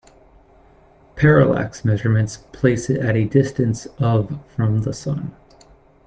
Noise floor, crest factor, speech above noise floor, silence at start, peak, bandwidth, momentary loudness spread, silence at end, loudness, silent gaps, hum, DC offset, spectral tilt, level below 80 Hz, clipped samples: -51 dBFS; 20 dB; 32 dB; 1.15 s; 0 dBFS; 9 kHz; 11 LU; 0.75 s; -19 LUFS; none; none; under 0.1%; -7.5 dB/octave; -46 dBFS; under 0.1%